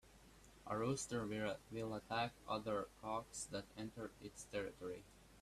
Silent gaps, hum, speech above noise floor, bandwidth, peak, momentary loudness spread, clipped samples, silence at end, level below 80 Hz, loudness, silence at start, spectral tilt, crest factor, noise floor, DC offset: none; none; 19 dB; 15 kHz; -28 dBFS; 13 LU; under 0.1%; 0 s; -68 dBFS; -46 LUFS; 0.05 s; -4.5 dB/octave; 18 dB; -65 dBFS; under 0.1%